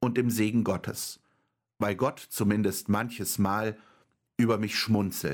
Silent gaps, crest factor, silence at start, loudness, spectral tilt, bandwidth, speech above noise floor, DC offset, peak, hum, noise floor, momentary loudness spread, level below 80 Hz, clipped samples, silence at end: none; 16 dB; 0 s; -29 LUFS; -5 dB/octave; 17.5 kHz; 47 dB; under 0.1%; -12 dBFS; none; -75 dBFS; 9 LU; -64 dBFS; under 0.1%; 0 s